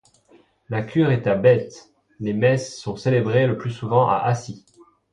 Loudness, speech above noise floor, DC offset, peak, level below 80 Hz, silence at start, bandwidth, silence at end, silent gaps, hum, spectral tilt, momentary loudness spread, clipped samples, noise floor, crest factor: -21 LUFS; 36 dB; under 0.1%; -4 dBFS; -56 dBFS; 0.7 s; 10.5 kHz; 0.55 s; none; none; -7 dB/octave; 13 LU; under 0.1%; -56 dBFS; 18 dB